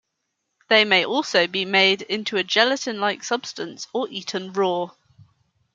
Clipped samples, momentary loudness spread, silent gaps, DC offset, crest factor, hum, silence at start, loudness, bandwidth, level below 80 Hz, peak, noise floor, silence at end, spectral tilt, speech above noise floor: under 0.1%; 11 LU; none; under 0.1%; 22 dB; none; 0.7 s; -21 LUFS; 7.8 kHz; -76 dBFS; -2 dBFS; -77 dBFS; 0.85 s; -3 dB/octave; 55 dB